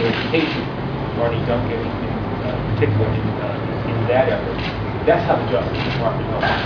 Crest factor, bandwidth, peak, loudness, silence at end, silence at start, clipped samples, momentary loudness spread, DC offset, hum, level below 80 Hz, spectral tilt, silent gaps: 16 dB; 5.4 kHz; -4 dBFS; -20 LUFS; 0 s; 0 s; under 0.1%; 6 LU; under 0.1%; none; -36 dBFS; -8 dB/octave; none